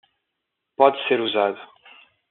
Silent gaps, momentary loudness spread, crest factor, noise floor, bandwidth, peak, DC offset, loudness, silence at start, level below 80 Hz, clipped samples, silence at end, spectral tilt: none; 18 LU; 22 dB; -80 dBFS; 4.3 kHz; -2 dBFS; under 0.1%; -20 LUFS; 0.8 s; -80 dBFS; under 0.1%; 0.65 s; -1 dB/octave